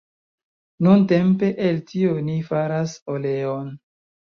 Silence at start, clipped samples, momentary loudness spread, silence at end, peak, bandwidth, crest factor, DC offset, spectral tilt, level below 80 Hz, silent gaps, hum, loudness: 0.8 s; under 0.1%; 11 LU; 0.55 s; -4 dBFS; 7 kHz; 18 dB; under 0.1%; -8 dB/octave; -62 dBFS; 3.02-3.06 s; none; -21 LUFS